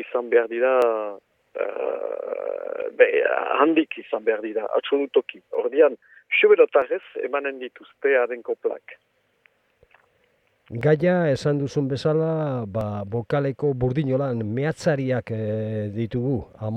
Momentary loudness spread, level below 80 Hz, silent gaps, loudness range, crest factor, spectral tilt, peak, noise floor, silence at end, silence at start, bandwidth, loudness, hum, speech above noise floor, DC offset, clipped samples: 11 LU; -56 dBFS; none; 5 LU; 20 dB; -7.5 dB/octave; -2 dBFS; -65 dBFS; 0 s; 0 s; 9.4 kHz; -23 LUFS; none; 43 dB; under 0.1%; under 0.1%